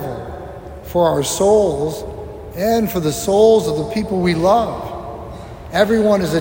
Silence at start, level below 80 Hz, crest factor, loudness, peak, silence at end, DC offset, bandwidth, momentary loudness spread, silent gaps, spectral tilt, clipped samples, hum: 0 s; -40 dBFS; 16 dB; -16 LUFS; 0 dBFS; 0 s; under 0.1%; 16.5 kHz; 18 LU; none; -5.5 dB/octave; under 0.1%; none